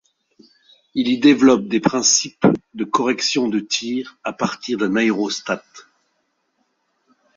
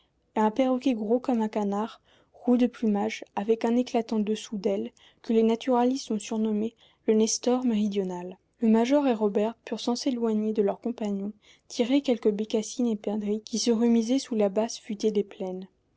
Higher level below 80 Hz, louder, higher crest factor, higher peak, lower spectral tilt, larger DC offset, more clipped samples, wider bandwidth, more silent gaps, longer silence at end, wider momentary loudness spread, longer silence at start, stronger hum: first, -60 dBFS vs -70 dBFS; first, -18 LUFS vs -27 LUFS; about the same, 18 dB vs 14 dB; first, -2 dBFS vs -12 dBFS; second, -3.5 dB/octave vs -5 dB/octave; neither; neither; about the same, 7.6 kHz vs 8 kHz; neither; first, 1.55 s vs 0.3 s; about the same, 11 LU vs 10 LU; first, 0.95 s vs 0.35 s; neither